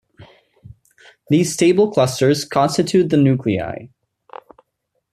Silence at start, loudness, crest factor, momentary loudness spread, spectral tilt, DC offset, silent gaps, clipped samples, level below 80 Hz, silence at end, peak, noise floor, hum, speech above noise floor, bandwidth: 0.2 s; -16 LUFS; 16 dB; 8 LU; -6 dB/octave; under 0.1%; none; under 0.1%; -56 dBFS; 1.25 s; -4 dBFS; -73 dBFS; none; 57 dB; 14.5 kHz